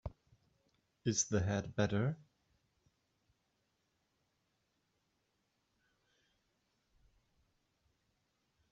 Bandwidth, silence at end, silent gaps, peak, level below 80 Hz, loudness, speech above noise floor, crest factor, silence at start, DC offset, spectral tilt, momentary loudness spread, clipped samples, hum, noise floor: 7.6 kHz; 6.55 s; none; -20 dBFS; -68 dBFS; -36 LUFS; 47 dB; 24 dB; 0.05 s; under 0.1%; -6 dB/octave; 12 LU; under 0.1%; none; -82 dBFS